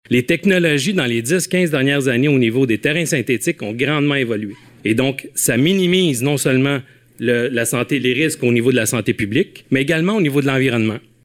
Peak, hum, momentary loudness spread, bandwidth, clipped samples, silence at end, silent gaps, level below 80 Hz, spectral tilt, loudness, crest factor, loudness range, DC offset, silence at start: -4 dBFS; none; 5 LU; 17 kHz; under 0.1%; 0.25 s; none; -54 dBFS; -4.5 dB/octave; -17 LUFS; 14 dB; 2 LU; under 0.1%; 0.1 s